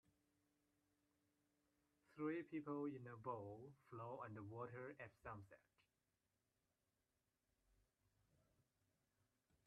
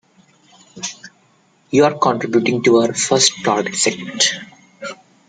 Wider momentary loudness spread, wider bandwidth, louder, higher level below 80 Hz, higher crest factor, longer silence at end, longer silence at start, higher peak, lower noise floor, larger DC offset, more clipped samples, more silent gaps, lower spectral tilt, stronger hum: second, 12 LU vs 17 LU; second, 6 kHz vs 9.6 kHz; second, -53 LUFS vs -16 LUFS; second, -86 dBFS vs -62 dBFS; about the same, 20 dB vs 18 dB; first, 4.1 s vs 0.35 s; first, 2.1 s vs 0.75 s; second, -36 dBFS vs 0 dBFS; first, under -90 dBFS vs -56 dBFS; neither; neither; neither; first, -7.5 dB/octave vs -3 dB/octave; neither